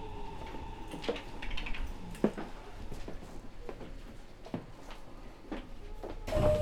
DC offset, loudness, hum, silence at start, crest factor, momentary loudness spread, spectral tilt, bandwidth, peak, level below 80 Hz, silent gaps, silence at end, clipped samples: under 0.1%; -41 LUFS; none; 0 s; 26 dB; 16 LU; -6.5 dB/octave; 15 kHz; -12 dBFS; -44 dBFS; none; 0 s; under 0.1%